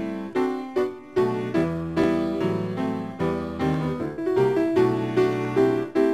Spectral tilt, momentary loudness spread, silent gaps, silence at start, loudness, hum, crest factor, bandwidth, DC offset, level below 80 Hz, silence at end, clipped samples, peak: -8 dB/octave; 6 LU; none; 0 s; -24 LUFS; none; 16 dB; 12 kHz; 0.2%; -54 dBFS; 0 s; under 0.1%; -8 dBFS